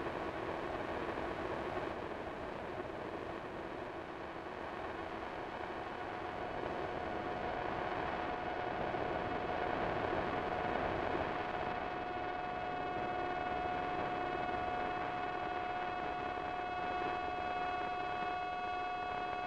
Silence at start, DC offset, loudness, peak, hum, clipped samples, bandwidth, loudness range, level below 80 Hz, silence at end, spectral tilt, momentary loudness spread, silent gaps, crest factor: 0 s; under 0.1%; -40 LUFS; -22 dBFS; none; under 0.1%; 10 kHz; 6 LU; -58 dBFS; 0 s; -6 dB/octave; 6 LU; none; 16 dB